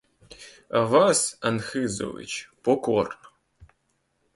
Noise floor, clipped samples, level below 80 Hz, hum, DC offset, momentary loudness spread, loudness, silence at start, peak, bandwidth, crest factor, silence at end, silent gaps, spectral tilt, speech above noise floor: -72 dBFS; under 0.1%; -60 dBFS; none; under 0.1%; 24 LU; -24 LUFS; 0.3 s; -6 dBFS; 11.5 kHz; 20 dB; 0.7 s; none; -4 dB/octave; 48 dB